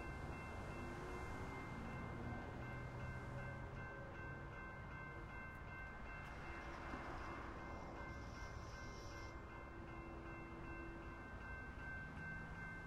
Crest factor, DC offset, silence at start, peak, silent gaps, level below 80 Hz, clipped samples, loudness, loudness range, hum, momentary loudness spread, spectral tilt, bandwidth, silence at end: 16 dB; under 0.1%; 0 s; -34 dBFS; none; -58 dBFS; under 0.1%; -52 LUFS; 3 LU; none; 3 LU; -6.5 dB/octave; 15 kHz; 0 s